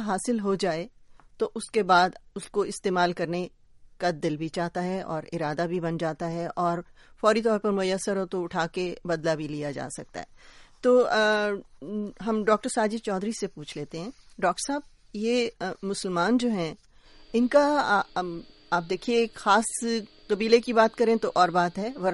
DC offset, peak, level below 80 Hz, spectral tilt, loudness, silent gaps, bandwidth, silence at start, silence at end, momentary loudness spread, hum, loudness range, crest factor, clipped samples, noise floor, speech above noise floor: under 0.1%; -6 dBFS; -58 dBFS; -4.5 dB/octave; -26 LUFS; none; 11.5 kHz; 0 s; 0 s; 13 LU; none; 5 LU; 20 dB; under 0.1%; -52 dBFS; 25 dB